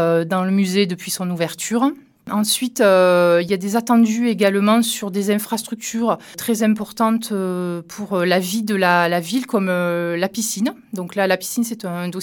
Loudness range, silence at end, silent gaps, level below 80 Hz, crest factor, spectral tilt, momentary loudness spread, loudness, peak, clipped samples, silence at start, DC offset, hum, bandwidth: 4 LU; 0 s; none; -68 dBFS; 18 dB; -4.5 dB/octave; 9 LU; -19 LUFS; -2 dBFS; under 0.1%; 0 s; under 0.1%; none; 18 kHz